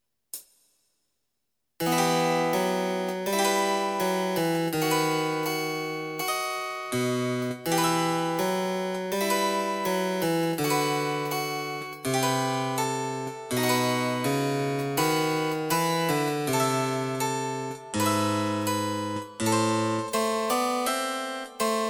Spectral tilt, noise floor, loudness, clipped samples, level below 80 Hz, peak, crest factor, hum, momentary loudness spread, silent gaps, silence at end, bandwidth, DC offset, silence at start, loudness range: -4 dB/octave; -82 dBFS; -27 LUFS; under 0.1%; -68 dBFS; -12 dBFS; 16 dB; none; 6 LU; none; 0 s; over 20 kHz; under 0.1%; 0.35 s; 2 LU